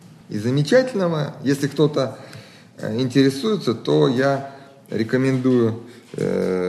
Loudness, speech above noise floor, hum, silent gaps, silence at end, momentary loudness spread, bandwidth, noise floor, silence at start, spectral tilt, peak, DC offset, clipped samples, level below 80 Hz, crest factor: -20 LUFS; 22 dB; none; none; 0 s; 15 LU; 13 kHz; -42 dBFS; 0.05 s; -6.5 dB/octave; -4 dBFS; under 0.1%; under 0.1%; -64 dBFS; 16 dB